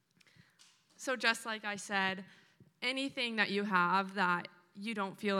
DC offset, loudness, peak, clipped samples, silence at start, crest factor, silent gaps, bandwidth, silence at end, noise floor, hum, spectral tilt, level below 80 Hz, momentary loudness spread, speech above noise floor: under 0.1%; -34 LUFS; -12 dBFS; under 0.1%; 1 s; 24 dB; none; 15.5 kHz; 0 s; -66 dBFS; none; -3.5 dB/octave; under -90 dBFS; 11 LU; 32 dB